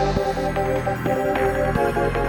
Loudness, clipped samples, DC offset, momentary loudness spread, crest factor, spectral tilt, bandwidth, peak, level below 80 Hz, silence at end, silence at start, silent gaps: -22 LUFS; under 0.1%; under 0.1%; 2 LU; 16 dB; -6.5 dB/octave; 18 kHz; -6 dBFS; -34 dBFS; 0 s; 0 s; none